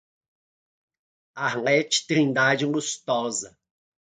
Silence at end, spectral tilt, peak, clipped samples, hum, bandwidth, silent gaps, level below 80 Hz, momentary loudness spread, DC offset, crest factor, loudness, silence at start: 0.55 s; -3.5 dB/octave; -6 dBFS; under 0.1%; none; 9.6 kHz; none; -74 dBFS; 9 LU; under 0.1%; 20 dB; -23 LUFS; 1.35 s